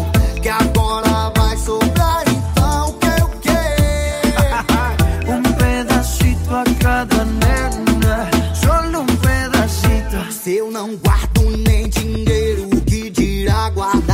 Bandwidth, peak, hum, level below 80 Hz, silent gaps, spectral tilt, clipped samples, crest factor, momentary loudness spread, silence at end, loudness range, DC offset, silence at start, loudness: 16.5 kHz; -2 dBFS; none; -20 dBFS; none; -5.5 dB/octave; under 0.1%; 12 dB; 3 LU; 0 s; 1 LU; under 0.1%; 0 s; -16 LUFS